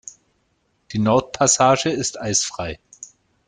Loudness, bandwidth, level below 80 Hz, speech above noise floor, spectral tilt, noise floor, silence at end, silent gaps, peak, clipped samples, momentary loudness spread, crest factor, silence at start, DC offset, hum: -19 LUFS; 10.5 kHz; -52 dBFS; 48 dB; -3.5 dB/octave; -67 dBFS; 0.4 s; none; -2 dBFS; under 0.1%; 25 LU; 20 dB; 0.05 s; under 0.1%; none